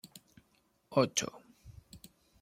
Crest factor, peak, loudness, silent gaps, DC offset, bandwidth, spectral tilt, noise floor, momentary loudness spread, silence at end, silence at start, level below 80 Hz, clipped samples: 26 dB; -14 dBFS; -33 LUFS; none; under 0.1%; 16.5 kHz; -3.5 dB/octave; -73 dBFS; 25 LU; 0.45 s; 0.05 s; -66 dBFS; under 0.1%